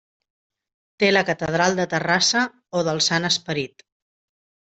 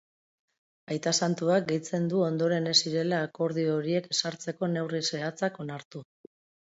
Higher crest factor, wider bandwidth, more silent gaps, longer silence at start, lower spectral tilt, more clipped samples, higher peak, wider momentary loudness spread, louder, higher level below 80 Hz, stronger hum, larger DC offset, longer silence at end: about the same, 18 dB vs 22 dB; about the same, 8.4 kHz vs 8 kHz; second, none vs 5.85-5.91 s; about the same, 1 s vs 0.9 s; about the same, -3 dB/octave vs -4 dB/octave; neither; first, -4 dBFS vs -8 dBFS; second, 8 LU vs 12 LU; first, -20 LUFS vs -28 LUFS; first, -60 dBFS vs -76 dBFS; neither; neither; first, 1 s vs 0.7 s